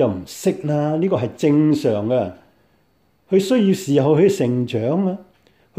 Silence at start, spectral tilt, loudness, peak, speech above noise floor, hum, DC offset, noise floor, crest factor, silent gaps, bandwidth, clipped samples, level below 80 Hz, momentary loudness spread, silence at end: 0 s; -7 dB/octave; -19 LUFS; -4 dBFS; 44 dB; none; under 0.1%; -61 dBFS; 14 dB; none; 15.5 kHz; under 0.1%; -60 dBFS; 7 LU; 0.55 s